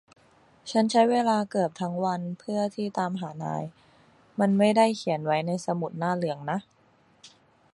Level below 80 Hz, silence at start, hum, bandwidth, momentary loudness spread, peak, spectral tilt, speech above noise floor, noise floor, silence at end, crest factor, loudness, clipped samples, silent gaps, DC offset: -72 dBFS; 0.65 s; none; 11.5 kHz; 12 LU; -8 dBFS; -6 dB/octave; 34 dB; -59 dBFS; 0.45 s; 18 dB; -26 LUFS; under 0.1%; none; under 0.1%